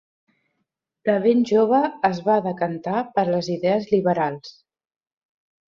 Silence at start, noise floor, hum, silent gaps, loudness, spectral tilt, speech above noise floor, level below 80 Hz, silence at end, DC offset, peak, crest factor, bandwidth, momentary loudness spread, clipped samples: 1.05 s; -77 dBFS; none; none; -21 LUFS; -7 dB/octave; 57 dB; -64 dBFS; 1.2 s; under 0.1%; -6 dBFS; 16 dB; 7.4 kHz; 8 LU; under 0.1%